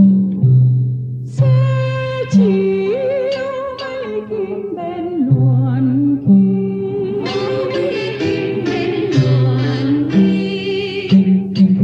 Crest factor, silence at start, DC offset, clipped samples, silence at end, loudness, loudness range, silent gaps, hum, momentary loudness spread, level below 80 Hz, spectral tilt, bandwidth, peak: 12 dB; 0 s; under 0.1%; under 0.1%; 0 s; -16 LUFS; 3 LU; none; none; 10 LU; -52 dBFS; -8.5 dB/octave; 7.2 kHz; -2 dBFS